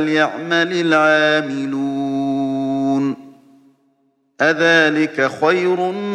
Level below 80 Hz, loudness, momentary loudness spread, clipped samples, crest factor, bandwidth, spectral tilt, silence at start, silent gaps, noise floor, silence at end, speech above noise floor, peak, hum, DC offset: -72 dBFS; -17 LUFS; 9 LU; under 0.1%; 16 dB; 9.8 kHz; -5 dB/octave; 0 s; none; -63 dBFS; 0 s; 47 dB; -2 dBFS; none; under 0.1%